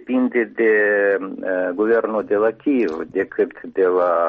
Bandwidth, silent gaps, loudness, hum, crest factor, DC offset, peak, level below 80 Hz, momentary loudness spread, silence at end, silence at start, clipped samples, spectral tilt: 5.4 kHz; none; -19 LUFS; none; 12 dB; under 0.1%; -8 dBFS; -62 dBFS; 7 LU; 0 s; 0 s; under 0.1%; -8 dB/octave